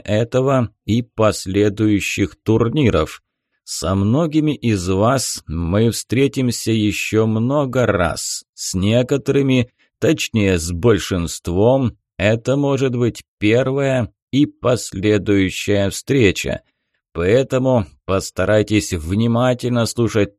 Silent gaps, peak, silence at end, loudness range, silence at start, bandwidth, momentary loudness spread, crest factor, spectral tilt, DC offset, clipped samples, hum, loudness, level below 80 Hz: 8.49-8.53 s, 13.28-13.37 s, 14.22-14.27 s; -2 dBFS; 0.1 s; 1 LU; 0.05 s; 13 kHz; 6 LU; 16 dB; -5.5 dB/octave; under 0.1%; under 0.1%; none; -18 LUFS; -40 dBFS